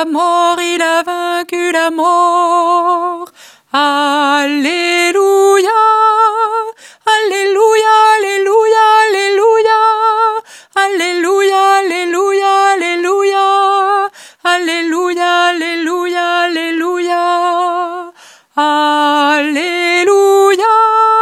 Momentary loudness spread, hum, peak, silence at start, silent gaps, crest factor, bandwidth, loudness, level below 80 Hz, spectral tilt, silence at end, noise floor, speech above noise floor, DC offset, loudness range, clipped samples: 7 LU; none; 0 dBFS; 0 s; none; 12 dB; 15.5 kHz; -11 LUFS; -72 dBFS; -0.5 dB/octave; 0 s; -39 dBFS; 27 dB; under 0.1%; 4 LU; under 0.1%